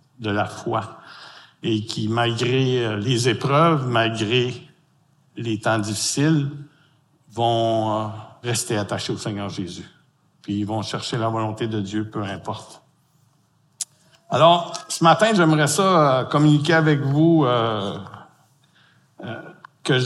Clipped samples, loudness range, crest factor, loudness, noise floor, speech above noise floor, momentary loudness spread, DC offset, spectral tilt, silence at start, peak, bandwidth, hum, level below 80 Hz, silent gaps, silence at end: under 0.1%; 10 LU; 20 dB; -21 LUFS; -62 dBFS; 41 dB; 18 LU; under 0.1%; -5 dB/octave; 0.2 s; -2 dBFS; 12.5 kHz; none; -64 dBFS; none; 0 s